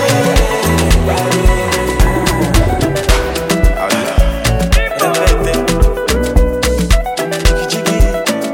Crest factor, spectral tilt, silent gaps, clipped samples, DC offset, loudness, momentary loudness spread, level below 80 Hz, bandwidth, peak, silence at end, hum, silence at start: 12 dB; -4.5 dB/octave; none; under 0.1%; under 0.1%; -13 LUFS; 3 LU; -14 dBFS; 17 kHz; 0 dBFS; 0 s; none; 0 s